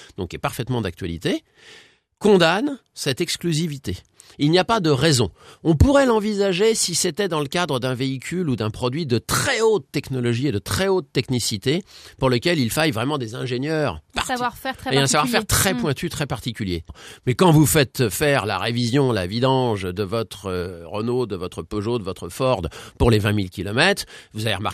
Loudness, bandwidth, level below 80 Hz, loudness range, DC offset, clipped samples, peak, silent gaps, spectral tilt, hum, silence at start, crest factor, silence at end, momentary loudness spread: -21 LUFS; 14.5 kHz; -40 dBFS; 4 LU; under 0.1%; under 0.1%; 0 dBFS; none; -4.5 dB/octave; none; 0 s; 20 dB; 0 s; 10 LU